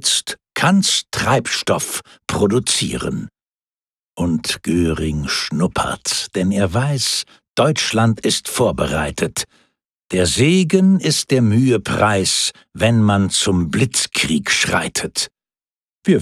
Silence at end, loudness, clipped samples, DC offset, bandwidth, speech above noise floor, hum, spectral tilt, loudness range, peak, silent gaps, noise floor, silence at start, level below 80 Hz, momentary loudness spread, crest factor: 0 s; -17 LUFS; under 0.1%; under 0.1%; 15 kHz; over 73 dB; none; -4 dB/octave; 5 LU; -2 dBFS; 3.55-3.72 s, 3.88-3.92 s, 4.05-4.10 s, 9.90-9.94 s, 15.76-16.00 s; under -90 dBFS; 0 s; -42 dBFS; 9 LU; 16 dB